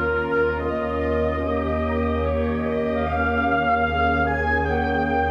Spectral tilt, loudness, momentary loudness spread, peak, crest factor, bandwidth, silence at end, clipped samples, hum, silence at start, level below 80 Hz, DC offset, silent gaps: -8.5 dB/octave; -22 LUFS; 3 LU; -10 dBFS; 12 dB; 6.6 kHz; 0 s; under 0.1%; none; 0 s; -34 dBFS; under 0.1%; none